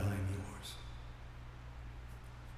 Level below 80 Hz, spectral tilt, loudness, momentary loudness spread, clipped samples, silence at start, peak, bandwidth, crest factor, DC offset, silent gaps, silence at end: -52 dBFS; -6 dB/octave; -46 LUFS; 12 LU; under 0.1%; 0 s; -26 dBFS; 14.5 kHz; 18 dB; under 0.1%; none; 0 s